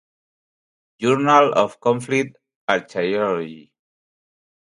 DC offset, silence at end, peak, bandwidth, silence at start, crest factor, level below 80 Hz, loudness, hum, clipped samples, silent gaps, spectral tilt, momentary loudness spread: under 0.1%; 1.15 s; 0 dBFS; 11.5 kHz; 1 s; 22 dB; -68 dBFS; -19 LUFS; none; under 0.1%; 2.55-2.68 s; -5.5 dB/octave; 13 LU